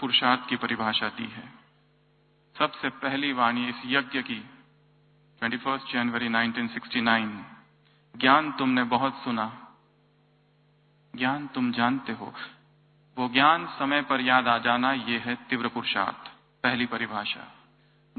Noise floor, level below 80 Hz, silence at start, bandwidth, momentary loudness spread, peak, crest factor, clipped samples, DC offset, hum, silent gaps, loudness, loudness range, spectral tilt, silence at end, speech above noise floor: -64 dBFS; -68 dBFS; 0 s; 4.6 kHz; 14 LU; -4 dBFS; 24 dB; under 0.1%; under 0.1%; 50 Hz at -65 dBFS; none; -26 LUFS; 5 LU; -8.5 dB/octave; 0.65 s; 37 dB